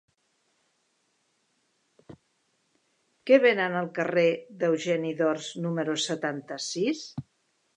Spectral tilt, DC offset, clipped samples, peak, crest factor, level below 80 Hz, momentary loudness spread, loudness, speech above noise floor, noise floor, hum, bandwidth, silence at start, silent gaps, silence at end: -4.5 dB/octave; under 0.1%; under 0.1%; -6 dBFS; 22 dB; -76 dBFS; 13 LU; -26 LUFS; 47 dB; -73 dBFS; none; 10 kHz; 2.1 s; none; 0.55 s